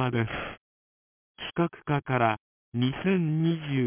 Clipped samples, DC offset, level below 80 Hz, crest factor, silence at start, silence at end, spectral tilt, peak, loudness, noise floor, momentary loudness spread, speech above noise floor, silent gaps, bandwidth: under 0.1%; under 0.1%; -58 dBFS; 20 dB; 0 s; 0 s; -6 dB/octave; -8 dBFS; -28 LUFS; under -90 dBFS; 11 LU; over 63 dB; 0.57-1.35 s, 2.39-2.72 s; 3.6 kHz